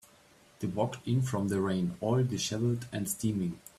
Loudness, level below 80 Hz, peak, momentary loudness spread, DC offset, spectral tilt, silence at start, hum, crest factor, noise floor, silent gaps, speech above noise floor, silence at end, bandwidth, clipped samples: -32 LUFS; -62 dBFS; -16 dBFS; 5 LU; under 0.1%; -6 dB/octave; 0.6 s; none; 16 dB; -61 dBFS; none; 30 dB; 0.2 s; 15 kHz; under 0.1%